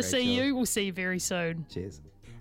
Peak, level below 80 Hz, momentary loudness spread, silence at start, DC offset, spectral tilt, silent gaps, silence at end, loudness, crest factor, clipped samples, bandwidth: -16 dBFS; -56 dBFS; 13 LU; 0 s; under 0.1%; -3.5 dB/octave; none; 0 s; -29 LUFS; 16 dB; under 0.1%; 16.5 kHz